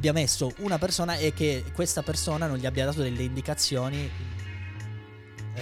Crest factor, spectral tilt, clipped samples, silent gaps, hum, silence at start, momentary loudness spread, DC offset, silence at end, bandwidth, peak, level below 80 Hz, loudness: 16 dB; -4 dB/octave; under 0.1%; none; none; 0 s; 13 LU; under 0.1%; 0 s; 16.5 kHz; -12 dBFS; -44 dBFS; -28 LUFS